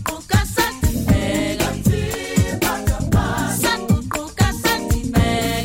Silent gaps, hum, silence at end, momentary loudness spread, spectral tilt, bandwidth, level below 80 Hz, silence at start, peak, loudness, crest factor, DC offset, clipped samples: none; none; 0 s; 3 LU; -5 dB/octave; 17 kHz; -28 dBFS; 0 s; -4 dBFS; -19 LUFS; 14 dB; under 0.1%; under 0.1%